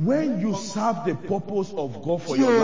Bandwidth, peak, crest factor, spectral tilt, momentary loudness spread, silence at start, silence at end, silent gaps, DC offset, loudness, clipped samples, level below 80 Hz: 7.6 kHz; -8 dBFS; 16 dB; -6 dB/octave; 6 LU; 0 s; 0 s; none; 0.8%; -25 LUFS; under 0.1%; -68 dBFS